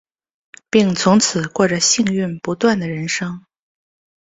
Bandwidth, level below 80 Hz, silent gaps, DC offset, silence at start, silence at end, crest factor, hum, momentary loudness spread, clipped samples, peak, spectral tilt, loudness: 8 kHz; -56 dBFS; none; under 0.1%; 0.75 s; 0.85 s; 18 dB; none; 9 LU; under 0.1%; 0 dBFS; -4 dB/octave; -17 LUFS